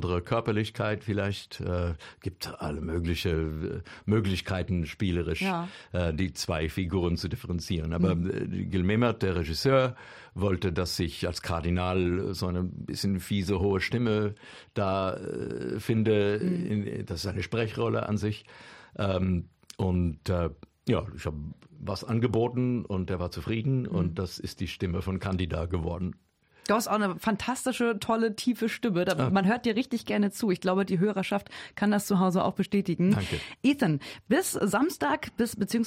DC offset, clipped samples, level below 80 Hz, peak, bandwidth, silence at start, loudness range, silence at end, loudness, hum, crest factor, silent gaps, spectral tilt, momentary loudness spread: under 0.1%; under 0.1%; -48 dBFS; -12 dBFS; 16 kHz; 0 s; 4 LU; 0 s; -29 LUFS; none; 18 dB; none; -6 dB/octave; 9 LU